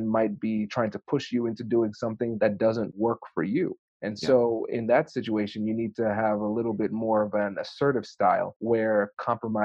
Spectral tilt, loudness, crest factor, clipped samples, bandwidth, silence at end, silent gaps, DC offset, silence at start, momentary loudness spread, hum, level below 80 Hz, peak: -7 dB/octave; -27 LUFS; 16 dB; under 0.1%; 8 kHz; 0 s; 3.79-4.00 s, 8.56-8.60 s; under 0.1%; 0 s; 6 LU; none; -66 dBFS; -10 dBFS